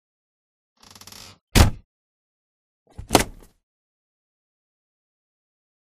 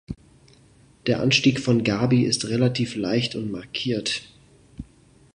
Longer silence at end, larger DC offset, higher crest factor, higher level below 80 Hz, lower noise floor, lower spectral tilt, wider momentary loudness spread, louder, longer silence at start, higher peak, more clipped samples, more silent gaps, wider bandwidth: first, 2.6 s vs 0.55 s; neither; first, 28 dB vs 22 dB; first, -32 dBFS vs -52 dBFS; second, -45 dBFS vs -54 dBFS; about the same, -4 dB/octave vs -5 dB/octave; first, 24 LU vs 21 LU; about the same, -21 LUFS vs -23 LUFS; first, 1.55 s vs 0.1 s; first, 0 dBFS vs -4 dBFS; neither; first, 1.84-2.86 s vs none; first, 15.5 kHz vs 11 kHz